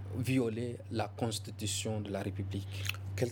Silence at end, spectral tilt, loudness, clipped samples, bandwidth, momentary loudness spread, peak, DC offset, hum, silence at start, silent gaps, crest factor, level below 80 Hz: 0 s; -5 dB/octave; -36 LUFS; under 0.1%; over 20 kHz; 6 LU; -18 dBFS; under 0.1%; none; 0 s; none; 18 dB; -70 dBFS